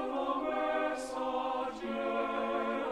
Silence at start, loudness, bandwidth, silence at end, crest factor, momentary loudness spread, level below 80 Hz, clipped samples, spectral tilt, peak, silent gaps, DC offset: 0 s; -34 LUFS; 13 kHz; 0 s; 12 dB; 4 LU; -66 dBFS; under 0.1%; -4 dB/octave; -22 dBFS; none; under 0.1%